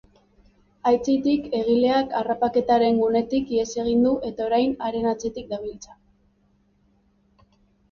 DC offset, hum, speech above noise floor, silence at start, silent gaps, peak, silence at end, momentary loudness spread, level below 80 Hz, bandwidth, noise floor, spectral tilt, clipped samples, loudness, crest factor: under 0.1%; none; 41 dB; 0.85 s; none; -8 dBFS; 2 s; 10 LU; -54 dBFS; 7.2 kHz; -63 dBFS; -5.5 dB/octave; under 0.1%; -22 LUFS; 14 dB